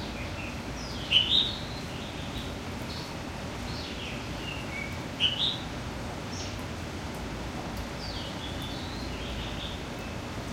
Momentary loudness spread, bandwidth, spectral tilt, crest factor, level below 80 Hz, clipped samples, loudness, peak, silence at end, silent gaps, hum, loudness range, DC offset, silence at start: 12 LU; 16 kHz; -4 dB/octave; 24 dB; -44 dBFS; under 0.1%; -32 LUFS; -10 dBFS; 0 s; none; none; 7 LU; under 0.1%; 0 s